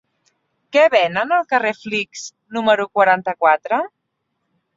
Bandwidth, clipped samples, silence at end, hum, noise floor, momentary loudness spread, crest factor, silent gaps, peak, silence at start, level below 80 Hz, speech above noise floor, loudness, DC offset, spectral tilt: 7.8 kHz; under 0.1%; 0.9 s; none; -74 dBFS; 12 LU; 18 dB; none; 0 dBFS; 0.75 s; -68 dBFS; 57 dB; -17 LUFS; under 0.1%; -3.5 dB/octave